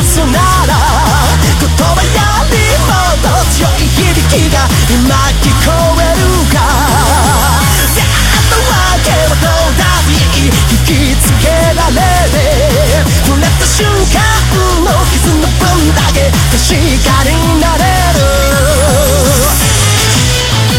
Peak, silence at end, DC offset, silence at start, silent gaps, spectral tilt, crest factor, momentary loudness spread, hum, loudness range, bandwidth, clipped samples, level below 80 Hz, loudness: 0 dBFS; 0 s; under 0.1%; 0 s; none; -4 dB/octave; 8 dB; 1 LU; none; 1 LU; 17 kHz; 0.2%; -12 dBFS; -8 LUFS